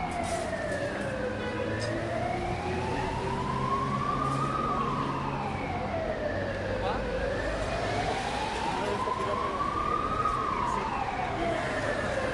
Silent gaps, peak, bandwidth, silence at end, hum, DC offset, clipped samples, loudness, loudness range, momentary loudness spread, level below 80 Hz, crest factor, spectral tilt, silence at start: none; -16 dBFS; 11.5 kHz; 0 s; none; under 0.1%; under 0.1%; -30 LUFS; 2 LU; 3 LU; -44 dBFS; 14 dB; -5.5 dB/octave; 0 s